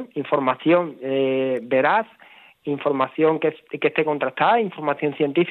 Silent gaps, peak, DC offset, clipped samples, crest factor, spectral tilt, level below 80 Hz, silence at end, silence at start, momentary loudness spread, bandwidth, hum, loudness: none; -4 dBFS; under 0.1%; under 0.1%; 18 dB; -8.5 dB/octave; -76 dBFS; 0 s; 0 s; 7 LU; 4.3 kHz; none; -21 LUFS